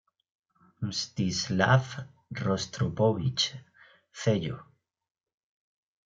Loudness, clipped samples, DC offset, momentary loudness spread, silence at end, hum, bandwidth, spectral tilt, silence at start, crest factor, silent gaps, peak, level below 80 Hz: -29 LUFS; under 0.1%; under 0.1%; 17 LU; 1.4 s; none; 7.8 kHz; -5 dB/octave; 0.8 s; 22 dB; none; -10 dBFS; -62 dBFS